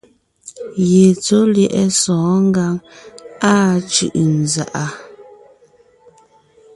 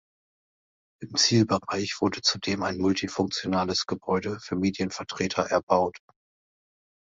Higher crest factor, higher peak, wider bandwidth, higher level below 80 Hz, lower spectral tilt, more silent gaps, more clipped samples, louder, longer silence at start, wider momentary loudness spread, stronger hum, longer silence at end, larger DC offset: second, 16 dB vs 22 dB; first, 0 dBFS vs -6 dBFS; first, 11.5 kHz vs 7.8 kHz; about the same, -54 dBFS vs -56 dBFS; about the same, -5 dB/octave vs -4 dB/octave; second, none vs 5.63-5.67 s; neither; first, -15 LUFS vs -26 LUFS; second, 0.45 s vs 1 s; first, 14 LU vs 8 LU; neither; first, 1.55 s vs 1.05 s; neither